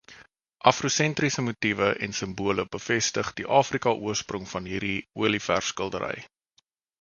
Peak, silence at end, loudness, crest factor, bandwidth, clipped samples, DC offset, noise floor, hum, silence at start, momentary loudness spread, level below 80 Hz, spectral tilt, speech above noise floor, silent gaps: -2 dBFS; 0.75 s; -26 LUFS; 26 dB; 10 kHz; under 0.1%; under 0.1%; -69 dBFS; none; 0.1 s; 8 LU; -56 dBFS; -3.5 dB/octave; 43 dB; none